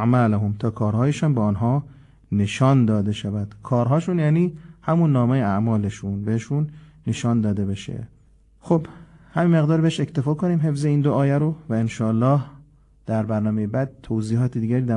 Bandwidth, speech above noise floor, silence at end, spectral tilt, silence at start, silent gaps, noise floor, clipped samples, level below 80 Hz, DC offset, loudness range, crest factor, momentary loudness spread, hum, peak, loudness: 10.5 kHz; 34 dB; 0 s; -8 dB/octave; 0 s; none; -54 dBFS; under 0.1%; -48 dBFS; under 0.1%; 4 LU; 14 dB; 9 LU; none; -6 dBFS; -22 LUFS